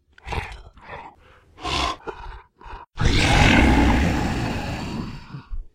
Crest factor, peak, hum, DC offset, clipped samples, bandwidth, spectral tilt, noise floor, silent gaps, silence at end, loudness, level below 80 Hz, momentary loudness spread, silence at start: 20 dB; -2 dBFS; none; under 0.1%; under 0.1%; 15.5 kHz; -5 dB/octave; -51 dBFS; none; 0.1 s; -21 LUFS; -28 dBFS; 24 LU; 0.25 s